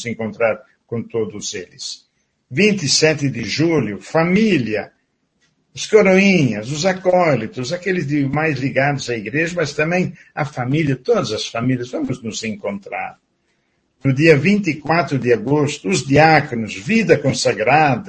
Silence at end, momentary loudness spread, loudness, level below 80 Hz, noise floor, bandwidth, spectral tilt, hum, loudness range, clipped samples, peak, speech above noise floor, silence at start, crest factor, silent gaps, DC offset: 0 s; 14 LU; -17 LUFS; -52 dBFS; -65 dBFS; 9.8 kHz; -5 dB/octave; none; 5 LU; under 0.1%; 0 dBFS; 48 dB; 0 s; 18 dB; none; under 0.1%